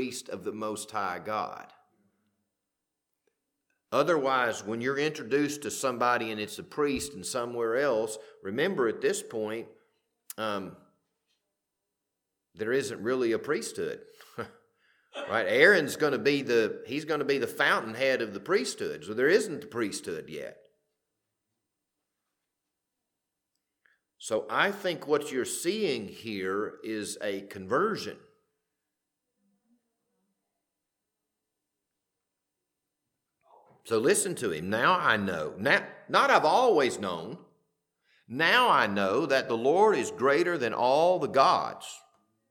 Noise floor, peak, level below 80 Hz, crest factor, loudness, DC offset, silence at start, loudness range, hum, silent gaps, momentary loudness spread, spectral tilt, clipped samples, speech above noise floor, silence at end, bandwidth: -86 dBFS; -6 dBFS; -72 dBFS; 24 dB; -28 LUFS; under 0.1%; 0 s; 11 LU; none; none; 15 LU; -3.5 dB/octave; under 0.1%; 58 dB; 0.55 s; 19 kHz